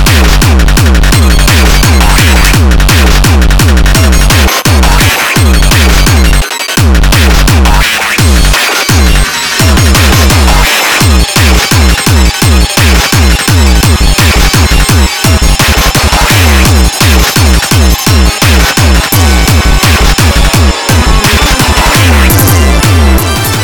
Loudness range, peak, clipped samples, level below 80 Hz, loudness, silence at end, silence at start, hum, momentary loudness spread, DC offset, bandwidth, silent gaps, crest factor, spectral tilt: 1 LU; 0 dBFS; 2%; -8 dBFS; -6 LUFS; 0 s; 0 s; none; 2 LU; 2%; over 20 kHz; none; 4 dB; -4 dB/octave